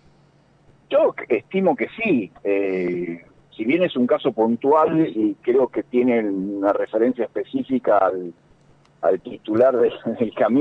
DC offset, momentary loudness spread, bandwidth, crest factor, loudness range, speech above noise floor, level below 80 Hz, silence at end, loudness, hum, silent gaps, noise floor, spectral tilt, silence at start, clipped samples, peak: under 0.1%; 8 LU; 5.6 kHz; 14 dB; 3 LU; 36 dB; -64 dBFS; 0 s; -21 LUFS; none; none; -56 dBFS; -8.5 dB/octave; 0.9 s; under 0.1%; -6 dBFS